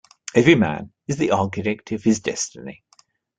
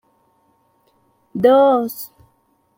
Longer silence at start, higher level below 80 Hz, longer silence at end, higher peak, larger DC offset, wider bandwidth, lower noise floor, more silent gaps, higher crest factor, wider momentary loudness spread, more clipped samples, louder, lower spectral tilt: second, 0.35 s vs 1.35 s; first, -56 dBFS vs -62 dBFS; about the same, 0.65 s vs 0.7 s; about the same, -2 dBFS vs -2 dBFS; neither; second, 9.4 kHz vs 16.5 kHz; about the same, -59 dBFS vs -62 dBFS; neither; about the same, 20 dB vs 18 dB; second, 14 LU vs 20 LU; neither; second, -21 LUFS vs -15 LUFS; about the same, -5 dB/octave vs -6 dB/octave